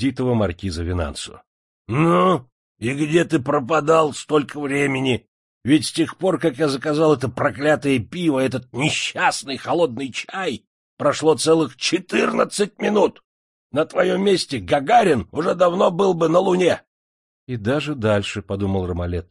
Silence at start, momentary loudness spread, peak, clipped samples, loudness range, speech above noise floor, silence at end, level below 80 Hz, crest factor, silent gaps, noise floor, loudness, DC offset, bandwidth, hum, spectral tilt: 0 s; 10 LU; -2 dBFS; under 0.1%; 3 LU; over 71 dB; 0.1 s; -50 dBFS; 18 dB; 1.47-1.85 s, 2.52-2.75 s, 5.28-5.61 s, 10.67-10.97 s, 13.24-13.70 s, 16.87-17.47 s; under -90 dBFS; -20 LUFS; under 0.1%; 11.5 kHz; none; -5.5 dB/octave